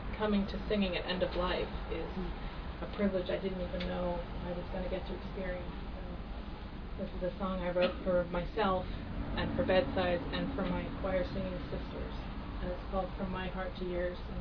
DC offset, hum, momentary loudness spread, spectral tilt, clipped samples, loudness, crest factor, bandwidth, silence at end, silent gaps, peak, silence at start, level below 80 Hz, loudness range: under 0.1%; none; 10 LU; -5 dB/octave; under 0.1%; -36 LUFS; 18 dB; 5.4 kHz; 0 s; none; -18 dBFS; 0 s; -42 dBFS; 6 LU